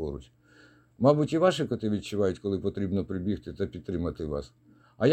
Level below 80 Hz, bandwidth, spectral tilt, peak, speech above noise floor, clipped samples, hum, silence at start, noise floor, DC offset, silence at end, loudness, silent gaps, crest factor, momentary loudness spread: -50 dBFS; 14 kHz; -7 dB/octave; -8 dBFS; 29 dB; under 0.1%; none; 0 s; -58 dBFS; under 0.1%; 0 s; -29 LUFS; none; 20 dB; 11 LU